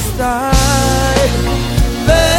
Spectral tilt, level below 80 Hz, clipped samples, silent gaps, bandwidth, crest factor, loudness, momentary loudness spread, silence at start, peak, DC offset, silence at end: -4.5 dB/octave; -18 dBFS; under 0.1%; none; 17 kHz; 12 dB; -13 LUFS; 5 LU; 0 s; 0 dBFS; under 0.1%; 0 s